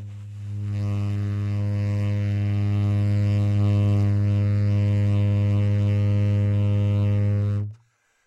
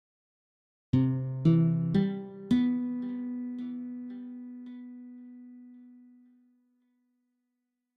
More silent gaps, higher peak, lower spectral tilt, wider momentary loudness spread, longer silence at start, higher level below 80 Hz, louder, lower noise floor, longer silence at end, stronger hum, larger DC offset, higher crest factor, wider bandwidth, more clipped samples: neither; about the same, -12 dBFS vs -12 dBFS; about the same, -9 dB/octave vs -10 dB/octave; second, 6 LU vs 22 LU; second, 0 s vs 0.95 s; first, -50 dBFS vs -62 dBFS; first, -23 LUFS vs -29 LUFS; second, -62 dBFS vs -83 dBFS; second, 0.5 s vs 1.95 s; neither; neither; second, 10 dB vs 20 dB; about the same, 5.4 kHz vs 5.2 kHz; neither